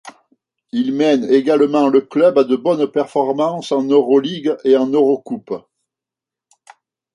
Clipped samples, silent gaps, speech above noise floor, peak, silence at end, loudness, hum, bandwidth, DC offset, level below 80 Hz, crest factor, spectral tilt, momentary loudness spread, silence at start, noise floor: under 0.1%; none; 72 dB; -2 dBFS; 1.55 s; -16 LUFS; none; 10.5 kHz; under 0.1%; -68 dBFS; 14 dB; -6.5 dB/octave; 9 LU; 0.05 s; -87 dBFS